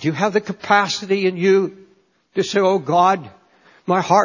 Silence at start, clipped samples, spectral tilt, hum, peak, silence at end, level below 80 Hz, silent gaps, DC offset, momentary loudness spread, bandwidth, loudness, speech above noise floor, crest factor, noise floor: 0 s; under 0.1%; -5 dB/octave; none; -2 dBFS; 0 s; -64 dBFS; none; under 0.1%; 8 LU; 7.4 kHz; -18 LUFS; 40 dB; 18 dB; -57 dBFS